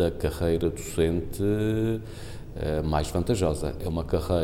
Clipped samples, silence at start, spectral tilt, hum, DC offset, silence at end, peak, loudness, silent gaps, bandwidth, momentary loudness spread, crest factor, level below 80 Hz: under 0.1%; 0 s; -6.5 dB/octave; none; under 0.1%; 0 s; -10 dBFS; -27 LUFS; none; 16.5 kHz; 8 LU; 16 dB; -36 dBFS